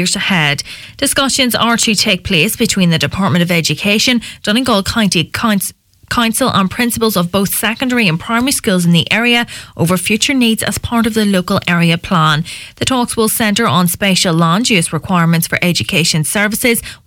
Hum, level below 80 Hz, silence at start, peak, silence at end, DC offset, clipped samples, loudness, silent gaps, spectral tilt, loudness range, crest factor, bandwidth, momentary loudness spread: none; -40 dBFS; 0 s; 0 dBFS; 0.1 s; under 0.1%; under 0.1%; -13 LUFS; none; -4 dB/octave; 2 LU; 14 dB; 18 kHz; 4 LU